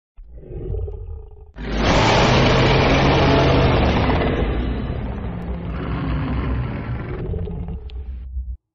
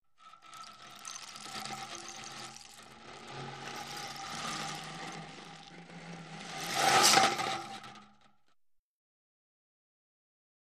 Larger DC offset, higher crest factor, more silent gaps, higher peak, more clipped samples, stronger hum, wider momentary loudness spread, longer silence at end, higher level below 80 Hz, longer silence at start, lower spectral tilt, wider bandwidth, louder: neither; second, 16 dB vs 28 dB; neither; first, -4 dBFS vs -8 dBFS; neither; neither; second, 18 LU vs 24 LU; second, 0.2 s vs 2.7 s; first, -26 dBFS vs -74 dBFS; about the same, 0.2 s vs 0.2 s; first, -5 dB/octave vs -1 dB/octave; second, 7.8 kHz vs 15.5 kHz; first, -19 LUFS vs -32 LUFS